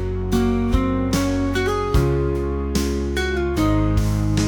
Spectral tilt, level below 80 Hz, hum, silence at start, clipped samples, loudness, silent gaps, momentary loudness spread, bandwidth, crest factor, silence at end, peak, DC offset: -6.5 dB/octave; -26 dBFS; none; 0 s; under 0.1%; -21 LUFS; none; 3 LU; 19.5 kHz; 14 dB; 0 s; -6 dBFS; under 0.1%